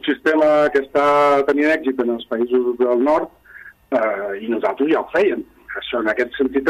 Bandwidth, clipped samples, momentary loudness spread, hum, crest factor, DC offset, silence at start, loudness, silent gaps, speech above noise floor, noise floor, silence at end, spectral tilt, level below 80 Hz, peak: 14 kHz; under 0.1%; 9 LU; none; 14 dB; under 0.1%; 0.05 s; -18 LUFS; none; 25 dB; -43 dBFS; 0 s; -5.5 dB/octave; -56 dBFS; -4 dBFS